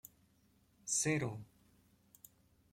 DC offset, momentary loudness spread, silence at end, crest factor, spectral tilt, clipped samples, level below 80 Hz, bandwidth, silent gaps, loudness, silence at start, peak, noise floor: under 0.1%; 19 LU; 1.25 s; 20 dB; -3.5 dB/octave; under 0.1%; -74 dBFS; 16.5 kHz; none; -36 LUFS; 0.85 s; -22 dBFS; -72 dBFS